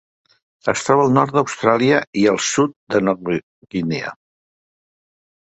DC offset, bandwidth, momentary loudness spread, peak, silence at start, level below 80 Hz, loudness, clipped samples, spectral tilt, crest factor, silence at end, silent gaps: under 0.1%; 8.4 kHz; 11 LU; 0 dBFS; 0.65 s; -58 dBFS; -18 LUFS; under 0.1%; -5 dB/octave; 20 dB; 1.3 s; 2.07-2.13 s, 2.76-2.87 s, 3.43-3.62 s